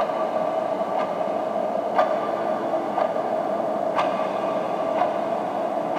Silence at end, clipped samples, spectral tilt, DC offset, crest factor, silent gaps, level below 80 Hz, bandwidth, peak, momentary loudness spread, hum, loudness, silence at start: 0 s; under 0.1%; -6 dB/octave; under 0.1%; 18 dB; none; -76 dBFS; 14.5 kHz; -6 dBFS; 2 LU; none; -24 LUFS; 0 s